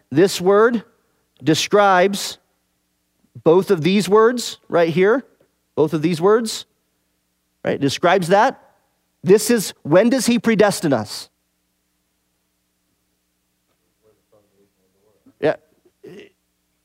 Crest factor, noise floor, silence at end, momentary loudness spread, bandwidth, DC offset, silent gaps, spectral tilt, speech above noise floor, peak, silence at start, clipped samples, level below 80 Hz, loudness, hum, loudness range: 18 dB; -69 dBFS; 0.6 s; 12 LU; 16 kHz; under 0.1%; none; -5 dB/octave; 53 dB; 0 dBFS; 0.1 s; under 0.1%; -66 dBFS; -17 LUFS; none; 14 LU